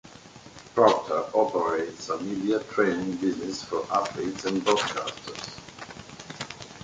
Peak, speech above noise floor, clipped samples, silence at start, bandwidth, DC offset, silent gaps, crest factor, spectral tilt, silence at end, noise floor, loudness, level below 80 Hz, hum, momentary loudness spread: -6 dBFS; 22 dB; under 0.1%; 0.05 s; 9.4 kHz; under 0.1%; none; 22 dB; -4.5 dB/octave; 0 s; -48 dBFS; -27 LUFS; -62 dBFS; none; 19 LU